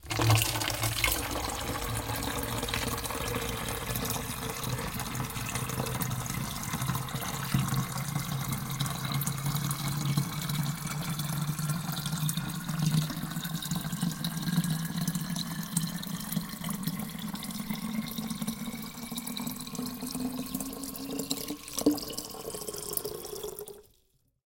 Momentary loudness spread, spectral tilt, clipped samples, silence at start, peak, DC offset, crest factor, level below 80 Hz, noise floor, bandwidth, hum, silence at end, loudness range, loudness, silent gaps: 8 LU; -4 dB/octave; under 0.1%; 0 s; -10 dBFS; under 0.1%; 22 dB; -48 dBFS; -70 dBFS; 17 kHz; none; 0.65 s; 4 LU; -32 LUFS; none